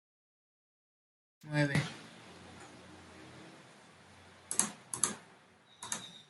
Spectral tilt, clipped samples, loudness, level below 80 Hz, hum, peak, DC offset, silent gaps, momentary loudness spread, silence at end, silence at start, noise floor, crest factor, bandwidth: -3.5 dB/octave; under 0.1%; -35 LUFS; -76 dBFS; none; -8 dBFS; under 0.1%; none; 24 LU; 0.05 s; 1.45 s; -62 dBFS; 32 dB; 12 kHz